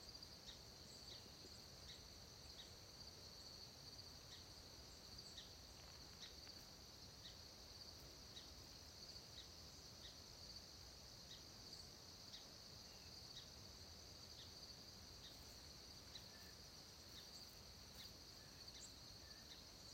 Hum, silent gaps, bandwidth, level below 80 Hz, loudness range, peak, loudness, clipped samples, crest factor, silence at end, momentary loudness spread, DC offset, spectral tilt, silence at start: none; none; 16 kHz; -72 dBFS; 0 LU; -44 dBFS; -58 LUFS; under 0.1%; 16 dB; 0 s; 2 LU; under 0.1%; -2.5 dB/octave; 0 s